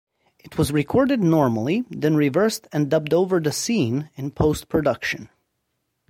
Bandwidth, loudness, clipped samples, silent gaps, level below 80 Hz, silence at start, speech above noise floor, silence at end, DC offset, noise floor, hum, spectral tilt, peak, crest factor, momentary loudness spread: 16.5 kHz; -21 LUFS; under 0.1%; none; -46 dBFS; 0.45 s; 54 dB; 0.85 s; under 0.1%; -75 dBFS; none; -6 dB/octave; -4 dBFS; 16 dB; 8 LU